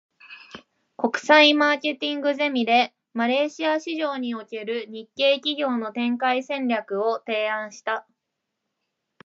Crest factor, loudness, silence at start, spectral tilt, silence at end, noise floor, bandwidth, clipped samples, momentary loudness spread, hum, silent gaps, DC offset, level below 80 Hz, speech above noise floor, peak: 20 dB; -23 LUFS; 0.25 s; -3 dB/octave; 1.25 s; -81 dBFS; 7.8 kHz; under 0.1%; 13 LU; none; none; under 0.1%; -80 dBFS; 58 dB; -4 dBFS